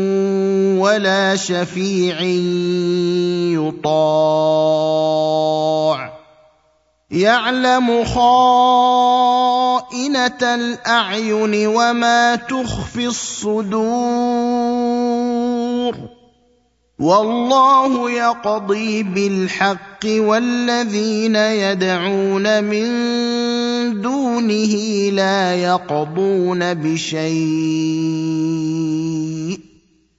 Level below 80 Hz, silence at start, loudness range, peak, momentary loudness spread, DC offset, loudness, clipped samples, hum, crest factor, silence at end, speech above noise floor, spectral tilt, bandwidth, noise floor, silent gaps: -48 dBFS; 0 s; 4 LU; 0 dBFS; 7 LU; under 0.1%; -17 LUFS; under 0.1%; none; 16 dB; 0.55 s; 44 dB; -5 dB/octave; 8 kHz; -60 dBFS; none